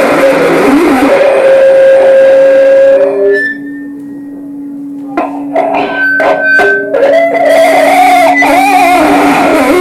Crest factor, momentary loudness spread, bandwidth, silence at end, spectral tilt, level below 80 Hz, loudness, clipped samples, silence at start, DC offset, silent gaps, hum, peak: 6 dB; 17 LU; 14.5 kHz; 0 s; -4 dB/octave; -42 dBFS; -6 LUFS; 0.3%; 0 s; under 0.1%; none; none; 0 dBFS